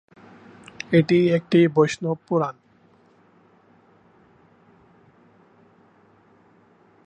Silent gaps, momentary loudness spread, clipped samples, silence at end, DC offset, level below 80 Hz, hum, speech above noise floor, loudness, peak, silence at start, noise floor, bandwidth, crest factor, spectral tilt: none; 11 LU; under 0.1%; 4.55 s; under 0.1%; -66 dBFS; none; 38 dB; -20 LUFS; -6 dBFS; 0.9 s; -57 dBFS; 9 kHz; 20 dB; -7 dB/octave